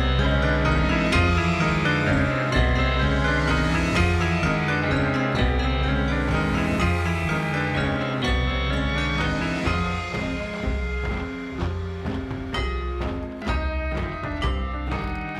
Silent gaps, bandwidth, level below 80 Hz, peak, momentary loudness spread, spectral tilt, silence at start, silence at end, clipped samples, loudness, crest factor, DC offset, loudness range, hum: none; 11 kHz; -28 dBFS; -8 dBFS; 8 LU; -6 dB/octave; 0 s; 0 s; under 0.1%; -24 LUFS; 16 dB; under 0.1%; 7 LU; none